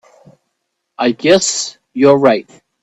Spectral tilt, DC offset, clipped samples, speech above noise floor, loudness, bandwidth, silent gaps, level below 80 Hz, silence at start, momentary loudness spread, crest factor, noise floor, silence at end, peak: -3.5 dB/octave; under 0.1%; under 0.1%; 59 dB; -13 LUFS; 9.8 kHz; none; -60 dBFS; 1 s; 10 LU; 16 dB; -72 dBFS; 0.4 s; 0 dBFS